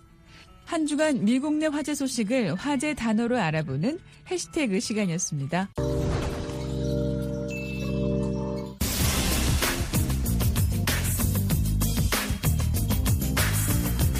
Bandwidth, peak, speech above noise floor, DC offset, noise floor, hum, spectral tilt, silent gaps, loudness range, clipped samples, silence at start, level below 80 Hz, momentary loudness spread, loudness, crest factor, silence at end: 15.5 kHz; -8 dBFS; 25 dB; under 0.1%; -51 dBFS; none; -5 dB/octave; none; 4 LU; under 0.1%; 0.3 s; -34 dBFS; 6 LU; -26 LUFS; 16 dB; 0 s